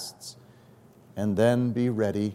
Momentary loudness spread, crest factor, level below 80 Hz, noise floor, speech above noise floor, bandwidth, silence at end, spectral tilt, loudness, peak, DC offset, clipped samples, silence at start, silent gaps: 20 LU; 18 dB; -68 dBFS; -54 dBFS; 30 dB; 16 kHz; 0 s; -6.5 dB/octave; -25 LUFS; -10 dBFS; under 0.1%; under 0.1%; 0 s; none